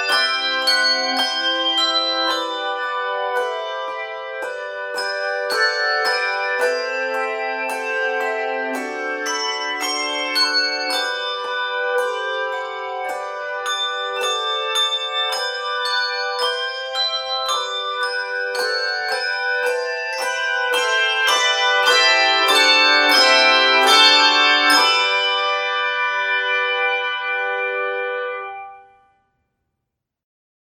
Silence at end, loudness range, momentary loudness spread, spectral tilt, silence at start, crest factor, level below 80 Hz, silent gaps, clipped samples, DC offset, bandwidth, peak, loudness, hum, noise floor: 1.85 s; 10 LU; 13 LU; 1.5 dB/octave; 0 s; 18 dB; -78 dBFS; none; under 0.1%; under 0.1%; 17 kHz; -2 dBFS; -18 LUFS; none; -80 dBFS